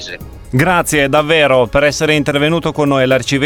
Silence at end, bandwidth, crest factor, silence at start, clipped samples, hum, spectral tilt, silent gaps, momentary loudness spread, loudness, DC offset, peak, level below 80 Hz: 0 s; 20 kHz; 12 dB; 0 s; under 0.1%; none; -4.5 dB/octave; none; 4 LU; -12 LUFS; under 0.1%; 0 dBFS; -36 dBFS